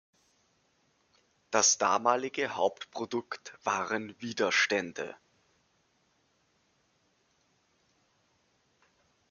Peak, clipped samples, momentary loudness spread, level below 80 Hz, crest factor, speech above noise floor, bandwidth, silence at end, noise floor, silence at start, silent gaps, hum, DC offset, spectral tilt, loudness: -10 dBFS; under 0.1%; 15 LU; -82 dBFS; 26 dB; 42 dB; 10.5 kHz; 4.15 s; -72 dBFS; 1.5 s; none; none; under 0.1%; -1.5 dB/octave; -29 LUFS